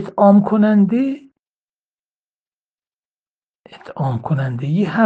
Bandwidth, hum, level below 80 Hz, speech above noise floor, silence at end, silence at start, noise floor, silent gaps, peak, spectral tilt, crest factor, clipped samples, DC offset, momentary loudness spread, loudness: 4.7 kHz; none; -60 dBFS; over 75 dB; 0 s; 0 s; under -90 dBFS; 1.39-2.77 s, 2.87-3.64 s; 0 dBFS; -10 dB/octave; 18 dB; under 0.1%; under 0.1%; 12 LU; -16 LUFS